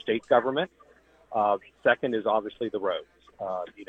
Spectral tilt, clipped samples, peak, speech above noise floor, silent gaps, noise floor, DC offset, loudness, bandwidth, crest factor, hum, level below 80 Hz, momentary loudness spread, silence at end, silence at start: -6.5 dB/octave; under 0.1%; -8 dBFS; 23 dB; none; -50 dBFS; under 0.1%; -27 LUFS; 8 kHz; 20 dB; none; -68 dBFS; 11 LU; 0.05 s; 0.05 s